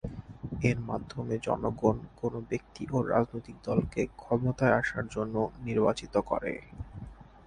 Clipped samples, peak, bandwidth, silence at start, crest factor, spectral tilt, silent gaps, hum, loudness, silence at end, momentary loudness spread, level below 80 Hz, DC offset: under 0.1%; -10 dBFS; 10.5 kHz; 0.05 s; 22 dB; -7.5 dB/octave; none; none; -31 LUFS; 0.25 s; 14 LU; -50 dBFS; under 0.1%